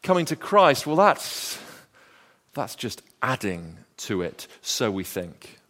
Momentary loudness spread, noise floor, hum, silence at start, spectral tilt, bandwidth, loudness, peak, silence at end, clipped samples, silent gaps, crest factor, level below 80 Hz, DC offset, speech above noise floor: 18 LU; -57 dBFS; none; 0.05 s; -4 dB/octave; 16 kHz; -24 LUFS; -4 dBFS; 0.2 s; under 0.1%; none; 22 dB; -62 dBFS; under 0.1%; 33 dB